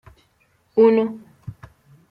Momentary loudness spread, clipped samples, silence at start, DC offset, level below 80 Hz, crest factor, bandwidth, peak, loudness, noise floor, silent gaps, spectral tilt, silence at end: 24 LU; under 0.1%; 0.75 s; under 0.1%; -58 dBFS; 18 dB; 5.2 kHz; -4 dBFS; -18 LUFS; -63 dBFS; none; -9 dB/octave; 0.6 s